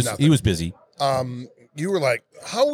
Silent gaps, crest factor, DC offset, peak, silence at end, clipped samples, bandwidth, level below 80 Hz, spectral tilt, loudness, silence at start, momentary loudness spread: none; 16 dB; under 0.1%; -6 dBFS; 0 s; under 0.1%; 16 kHz; -46 dBFS; -5.5 dB/octave; -23 LUFS; 0 s; 14 LU